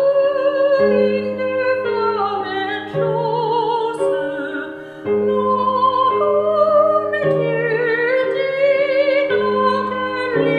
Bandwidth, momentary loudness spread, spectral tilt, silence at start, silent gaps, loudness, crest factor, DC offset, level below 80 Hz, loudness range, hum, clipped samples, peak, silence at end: 10 kHz; 7 LU; -7 dB/octave; 0 s; none; -17 LUFS; 14 dB; under 0.1%; -60 dBFS; 4 LU; none; under 0.1%; -4 dBFS; 0 s